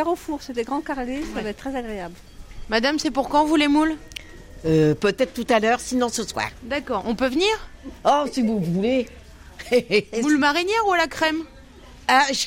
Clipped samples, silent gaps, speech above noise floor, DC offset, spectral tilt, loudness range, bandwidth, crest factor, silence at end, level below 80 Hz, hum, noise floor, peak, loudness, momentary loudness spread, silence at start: under 0.1%; none; 23 dB; under 0.1%; -4.5 dB/octave; 2 LU; 16.5 kHz; 16 dB; 0 s; -44 dBFS; none; -44 dBFS; -6 dBFS; -22 LUFS; 12 LU; 0 s